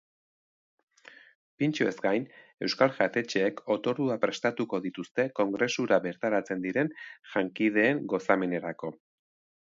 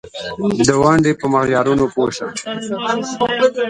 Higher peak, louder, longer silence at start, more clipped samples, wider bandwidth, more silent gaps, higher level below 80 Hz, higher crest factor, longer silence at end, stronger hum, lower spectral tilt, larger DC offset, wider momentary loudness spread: second, -8 dBFS vs 0 dBFS; second, -29 LUFS vs -16 LUFS; first, 1.6 s vs 0.05 s; neither; second, 7.6 kHz vs 11.5 kHz; first, 2.54-2.58 s, 5.11-5.15 s vs none; second, -76 dBFS vs -44 dBFS; first, 22 dB vs 16 dB; first, 0.8 s vs 0 s; neither; about the same, -5.5 dB/octave vs -5 dB/octave; neither; second, 8 LU vs 11 LU